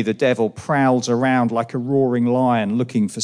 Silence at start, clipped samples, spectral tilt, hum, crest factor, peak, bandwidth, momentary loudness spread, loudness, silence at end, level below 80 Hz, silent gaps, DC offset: 0 s; under 0.1%; -6 dB/octave; none; 12 dB; -6 dBFS; 10.5 kHz; 4 LU; -19 LUFS; 0 s; -64 dBFS; none; under 0.1%